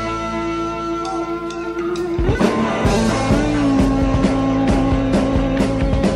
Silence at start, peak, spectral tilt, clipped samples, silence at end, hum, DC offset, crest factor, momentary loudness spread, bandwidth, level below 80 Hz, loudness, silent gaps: 0 s; -2 dBFS; -6.5 dB/octave; under 0.1%; 0 s; none; under 0.1%; 14 dB; 7 LU; 12 kHz; -26 dBFS; -18 LUFS; none